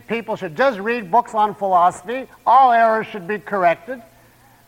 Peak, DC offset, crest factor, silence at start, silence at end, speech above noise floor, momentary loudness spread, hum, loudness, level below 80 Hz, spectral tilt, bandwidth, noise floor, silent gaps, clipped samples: -4 dBFS; under 0.1%; 16 dB; 0.1 s; 0.65 s; 33 dB; 14 LU; none; -18 LUFS; -62 dBFS; -5.5 dB/octave; 16 kHz; -51 dBFS; none; under 0.1%